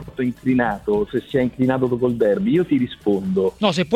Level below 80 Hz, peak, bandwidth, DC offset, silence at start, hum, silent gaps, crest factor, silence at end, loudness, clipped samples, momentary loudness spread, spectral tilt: -48 dBFS; -4 dBFS; 12 kHz; under 0.1%; 0 s; none; none; 16 dB; 0 s; -20 LUFS; under 0.1%; 4 LU; -7 dB/octave